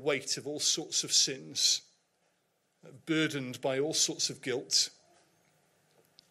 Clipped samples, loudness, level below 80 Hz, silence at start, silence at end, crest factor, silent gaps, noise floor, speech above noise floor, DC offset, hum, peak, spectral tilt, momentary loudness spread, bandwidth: under 0.1%; -29 LUFS; -84 dBFS; 0 s; 1.4 s; 20 dB; none; -76 dBFS; 44 dB; under 0.1%; none; -14 dBFS; -1.5 dB/octave; 8 LU; 16 kHz